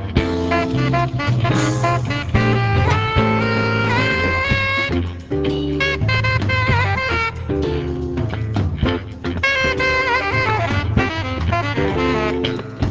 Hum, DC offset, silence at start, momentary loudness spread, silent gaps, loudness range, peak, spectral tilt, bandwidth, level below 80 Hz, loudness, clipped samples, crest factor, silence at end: none; under 0.1%; 0 s; 6 LU; none; 2 LU; -2 dBFS; -6 dB/octave; 8 kHz; -30 dBFS; -18 LUFS; under 0.1%; 16 dB; 0 s